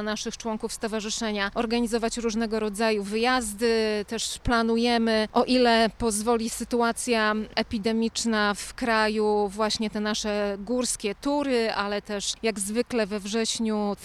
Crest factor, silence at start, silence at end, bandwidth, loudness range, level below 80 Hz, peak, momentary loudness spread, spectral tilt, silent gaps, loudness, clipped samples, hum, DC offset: 16 dB; 0 s; 0 s; 14 kHz; 3 LU; -48 dBFS; -8 dBFS; 6 LU; -3.5 dB/octave; none; -25 LUFS; under 0.1%; none; under 0.1%